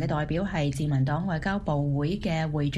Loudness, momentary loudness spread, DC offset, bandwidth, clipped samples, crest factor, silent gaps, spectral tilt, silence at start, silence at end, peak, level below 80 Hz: -27 LUFS; 2 LU; under 0.1%; 11.5 kHz; under 0.1%; 12 dB; none; -7.5 dB/octave; 0 s; 0 s; -14 dBFS; -42 dBFS